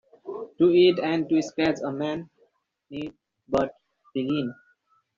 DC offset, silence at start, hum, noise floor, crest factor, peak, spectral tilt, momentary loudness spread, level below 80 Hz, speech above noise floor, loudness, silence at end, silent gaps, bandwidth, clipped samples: under 0.1%; 0.25 s; none; -67 dBFS; 18 dB; -8 dBFS; -4.5 dB/octave; 19 LU; -60 dBFS; 43 dB; -25 LUFS; 0.65 s; none; 7.4 kHz; under 0.1%